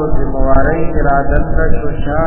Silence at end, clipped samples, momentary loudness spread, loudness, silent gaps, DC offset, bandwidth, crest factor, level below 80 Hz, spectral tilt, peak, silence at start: 0 s; 0.3%; 4 LU; -15 LUFS; none; under 0.1%; 3.2 kHz; 10 dB; -18 dBFS; -11.5 dB/octave; 0 dBFS; 0 s